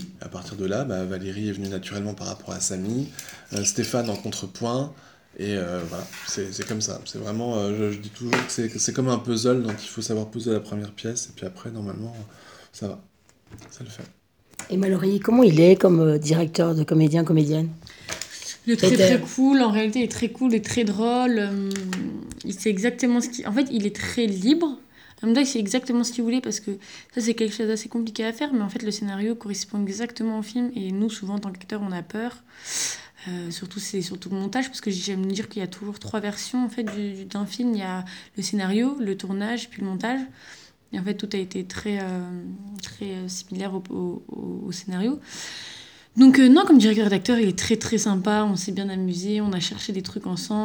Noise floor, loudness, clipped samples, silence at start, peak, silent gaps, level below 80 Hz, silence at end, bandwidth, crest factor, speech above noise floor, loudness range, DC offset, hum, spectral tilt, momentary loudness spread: -43 dBFS; -24 LUFS; under 0.1%; 0 s; -2 dBFS; none; -62 dBFS; 0 s; over 20 kHz; 20 dB; 20 dB; 12 LU; under 0.1%; none; -5 dB/octave; 15 LU